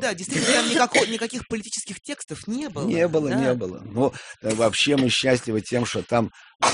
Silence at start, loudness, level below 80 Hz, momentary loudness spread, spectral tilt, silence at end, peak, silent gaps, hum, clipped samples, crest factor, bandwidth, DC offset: 0 s; -23 LUFS; -56 dBFS; 12 LU; -3.5 dB/octave; 0 s; -6 dBFS; 6.55-6.59 s; none; under 0.1%; 18 dB; 11 kHz; under 0.1%